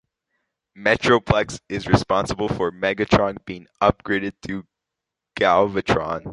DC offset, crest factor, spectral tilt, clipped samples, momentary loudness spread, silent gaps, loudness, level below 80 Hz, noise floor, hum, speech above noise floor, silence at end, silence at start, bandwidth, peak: under 0.1%; 20 dB; -5.5 dB/octave; under 0.1%; 14 LU; none; -21 LUFS; -42 dBFS; -84 dBFS; none; 63 dB; 0 s; 0.75 s; 11.5 kHz; -2 dBFS